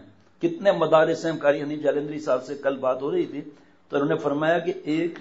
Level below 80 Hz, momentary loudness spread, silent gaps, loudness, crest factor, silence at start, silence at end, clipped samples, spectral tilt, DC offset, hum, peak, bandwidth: -72 dBFS; 9 LU; none; -24 LUFS; 18 dB; 0 s; 0 s; under 0.1%; -6.5 dB/octave; 0.1%; none; -6 dBFS; 8 kHz